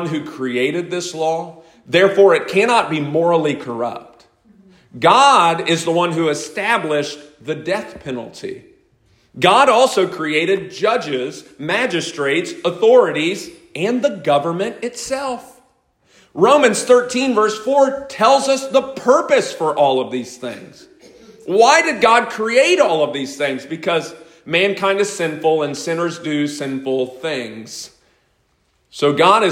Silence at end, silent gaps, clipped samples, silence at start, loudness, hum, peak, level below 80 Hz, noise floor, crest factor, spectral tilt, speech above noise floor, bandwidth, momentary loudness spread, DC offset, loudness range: 0 s; none; under 0.1%; 0 s; -16 LUFS; none; 0 dBFS; -62 dBFS; -62 dBFS; 16 dB; -4 dB/octave; 46 dB; 16 kHz; 16 LU; under 0.1%; 5 LU